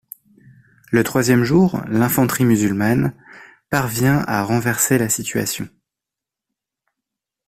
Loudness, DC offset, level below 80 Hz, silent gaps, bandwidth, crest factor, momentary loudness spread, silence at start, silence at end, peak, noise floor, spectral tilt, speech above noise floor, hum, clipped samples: -18 LUFS; under 0.1%; -50 dBFS; none; 16 kHz; 16 dB; 7 LU; 0.9 s; 1.8 s; -2 dBFS; -86 dBFS; -5 dB/octave; 69 dB; none; under 0.1%